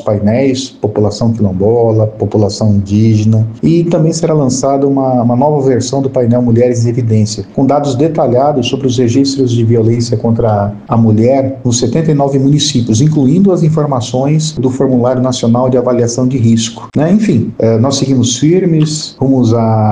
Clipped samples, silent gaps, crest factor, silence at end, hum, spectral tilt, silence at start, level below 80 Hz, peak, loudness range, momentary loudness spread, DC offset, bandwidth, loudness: under 0.1%; none; 10 dB; 0 s; none; -6.5 dB/octave; 0 s; -42 dBFS; 0 dBFS; 1 LU; 4 LU; 0.3%; 9.8 kHz; -11 LUFS